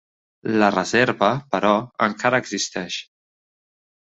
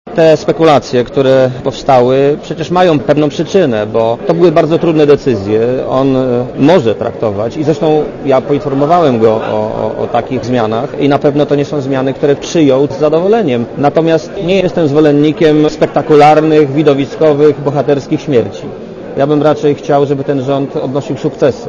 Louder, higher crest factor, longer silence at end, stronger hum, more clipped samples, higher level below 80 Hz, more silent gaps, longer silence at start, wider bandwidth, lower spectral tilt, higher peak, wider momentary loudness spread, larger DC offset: second, -21 LUFS vs -10 LUFS; first, 20 dB vs 10 dB; first, 1.15 s vs 0 s; neither; second, under 0.1% vs 0.7%; second, -60 dBFS vs -40 dBFS; neither; first, 0.45 s vs 0.05 s; first, 8.2 kHz vs 7.4 kHz; second, -4 dB/octave vs -7 dB/octave; about the same, -2 dBFS vs 0 dBFS; first, 10 LU vs 7 LU; neither